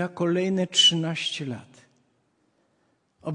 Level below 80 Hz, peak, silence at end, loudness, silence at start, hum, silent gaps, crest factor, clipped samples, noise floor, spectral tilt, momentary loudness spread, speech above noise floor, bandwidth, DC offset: -72 dBFS; -8 dBFS; 0 s; -22 LUFS; 0 s; none; none; 20 dB; under 0.1%; -69 dBFS; -3.5 dB/octave; 19 LU; 45 dB; 11 kHz; under 0.1%